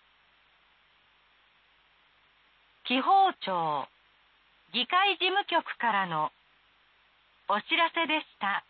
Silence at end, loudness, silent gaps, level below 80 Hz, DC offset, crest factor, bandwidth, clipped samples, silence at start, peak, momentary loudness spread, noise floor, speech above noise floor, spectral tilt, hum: 0.1 s; -27 LUFS; none; -82 dBFS; under 0.1%; 18 dB; 4.8 kHz; under 0.1%; 2.85 s; -14 dBFS; 11 LU; -65 dBFS; 37 dB; -7 dB/octave; none